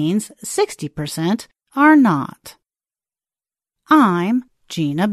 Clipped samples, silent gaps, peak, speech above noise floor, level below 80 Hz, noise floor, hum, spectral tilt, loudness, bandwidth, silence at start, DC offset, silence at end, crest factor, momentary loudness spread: under 0.1%; none; -2 dBFS; over 73 dB; -58 dBFS; under -90 dBFS; none; -5.5 dB/octave; -17 LUFS; 13.5 kHz; 0 s; under 0.1%; 0 s; 16 dB; 14 LU